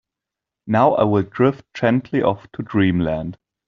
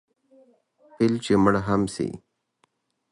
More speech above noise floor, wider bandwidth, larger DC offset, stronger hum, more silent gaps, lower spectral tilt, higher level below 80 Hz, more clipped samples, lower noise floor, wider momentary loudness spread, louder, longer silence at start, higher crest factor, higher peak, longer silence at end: first, 67 dB vs 48 dB; second, 7 kHz vs 11.5 kHz; neither; neither; neither; about the same, -6.5 dB/octave vs -6.5 dB/octave; about the same, -50 dBFS vs -52 dBFS; neither; first, -86 dBFS vs -70 dBFS; second, 9 LU vs 12 LU; first, -19 LUFS vs -23 LUFS; second, 0.65 s vs 1 s; about the same, 18 dB vs 20 dB; first, -2 dBFS vs -6 dBFS; second, 0.35 s vs 0.95 s